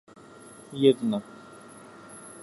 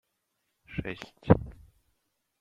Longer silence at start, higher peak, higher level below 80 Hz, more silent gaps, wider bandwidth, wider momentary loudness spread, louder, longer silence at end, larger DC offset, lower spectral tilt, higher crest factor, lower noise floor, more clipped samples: about the same, 0.7 s vs 0.7 s; about the same, -6 dBFS vs -4 dBFS; second, -74 dBFS vs -48 dBFS; neither; first, 12 kHz vs 7.4 kHz; first, 25 LU vs 16 LU; first, -25 LUFS vs -29 LUFS; second, 0 s vs 0.9 s; neither; second, -6 dB/octave vs -9 dB/octave; second, 22 dB vs 30 dB; second, -49 dBFS vs -79 dBFS; neither